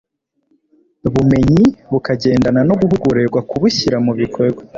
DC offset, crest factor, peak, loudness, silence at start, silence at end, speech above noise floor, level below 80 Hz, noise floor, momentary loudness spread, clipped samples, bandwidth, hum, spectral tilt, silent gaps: under 0.1%; 12 dB; -2 dBFS; -14 LUFS; 1.05 s; 0 s; 50 dB; -38 dBFS; -63 dBFS; 7 LU; under 0.1%; 7.6 kHz; none; -7 dB/octave; none